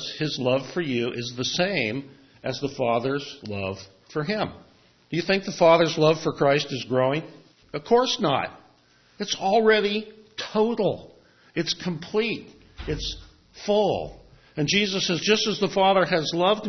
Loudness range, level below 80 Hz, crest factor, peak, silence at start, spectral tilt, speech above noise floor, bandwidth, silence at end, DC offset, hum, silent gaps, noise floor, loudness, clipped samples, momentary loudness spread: 6 LU; -52 dBFS; 20 dB; -4 dBFS; 0 s; -4.5 dB/octave; 35 dB; 6.4 kHz; 0 s; under 0.1%; none; none; -59 dBFS; -24 LUFS; under 0.1%; 15 LU